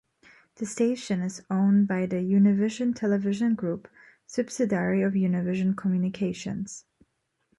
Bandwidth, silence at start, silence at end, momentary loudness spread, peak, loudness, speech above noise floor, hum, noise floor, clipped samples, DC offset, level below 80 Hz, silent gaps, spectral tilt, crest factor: 11.5 kHz; 0.6 s; 0.8 s; 12 LU; -12 dBFS; -26 LUFS; 48 dB; none; -73 dBFS; under 0.1%; under 0.1%; -66 dBFS; none; -7 dB/octave; 14 dB